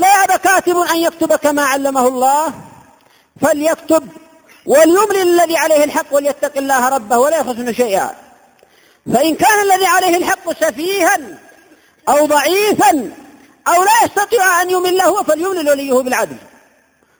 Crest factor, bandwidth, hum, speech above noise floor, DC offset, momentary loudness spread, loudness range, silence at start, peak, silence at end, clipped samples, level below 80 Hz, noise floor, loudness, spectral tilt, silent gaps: 14 dB; over 20 kHz; none; 41 dB; under 0.1%; 8 LU; 3 LU; 0 s; 0 dBFS; 0.8 s; under 0.1%; -56 dBFS; -54 dBFS; -13 LUFS; -2.5 dB/octave; none